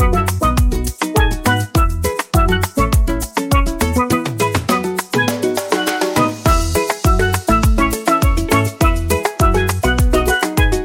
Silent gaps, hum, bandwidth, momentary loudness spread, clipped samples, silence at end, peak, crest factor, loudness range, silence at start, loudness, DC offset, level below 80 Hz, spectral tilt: none; none; 17 kHz; 3 LU; under 0.1%; 0 s; -2 dBFS; 14 dB; 2 LU; 0 s; -16 LUFS; under 0.1%; -20 dBFS; -5 dB/octave